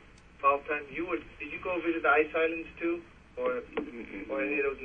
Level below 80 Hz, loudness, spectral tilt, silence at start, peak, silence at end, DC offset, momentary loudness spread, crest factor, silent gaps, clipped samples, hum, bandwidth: -58 dBFS; -31 LUFS; -6.5 dB/octave; 0 s; -12 dBFS; 0 s; under 0.1%; 13 LU; 20 dB; none; under 0.1%; none; 6.6 kHz